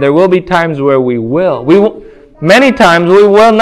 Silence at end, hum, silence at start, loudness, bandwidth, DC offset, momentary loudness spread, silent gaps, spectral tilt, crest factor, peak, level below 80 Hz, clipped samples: 0 s; none; 0 s; -8 LUFS; 12.5 kHz; under 0.1%; 7 LU; none; -6 dB/octave; 8 dB; 0 dBFS; -42 dBFS; 2%